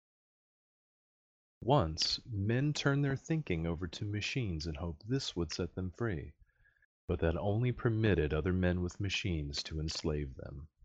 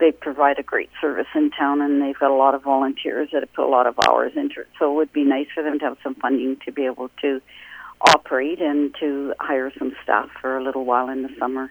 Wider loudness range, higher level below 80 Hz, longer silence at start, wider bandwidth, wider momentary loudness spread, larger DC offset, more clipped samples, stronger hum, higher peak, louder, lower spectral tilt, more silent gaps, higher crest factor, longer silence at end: about the same, 4 LU vs 4 LU; first, -50 dBFS vs -60 dBFS; first, 1.6 s vs 0 s; second, 8.4 kHz vs over 20 kHz; about the same, 9 LU vs 9 LU; neither; neither; neither; second, -16 dBFS vs 0 dBFS; second, -35 LUFS vs -21 LUFS; first, -5.5 dB/octave vs -3.5 dB/octave; first, 6.85-7.08 s vs none; about the same, 20 dB vs 20 dB; first, 0.2 s vs 0 s